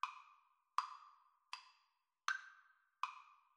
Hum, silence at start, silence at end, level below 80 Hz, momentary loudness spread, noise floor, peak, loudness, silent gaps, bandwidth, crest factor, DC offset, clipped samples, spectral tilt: none; 0.05 s; 0.2 s; under -90 dBFS; 22 LU; -83 dBFS; -20 dBFS; -47 LUFS; none; 11.5 kHz; 30 dB; under 0.1%; under 0.1%; 5 dB/octave